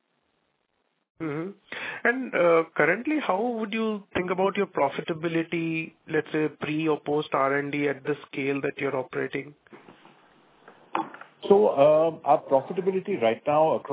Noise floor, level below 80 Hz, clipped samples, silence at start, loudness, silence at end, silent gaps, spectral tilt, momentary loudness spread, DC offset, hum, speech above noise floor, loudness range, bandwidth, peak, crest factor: -74 dBFS; -68 dBFS; under 0.1%; 1.2 s; -26 LUFS; 0 s; none; -10 dB/octave; 11 LU; under 0.1%; none; 49 dB; 6 LU; 4 kHz; -6 dBFS; 20 dB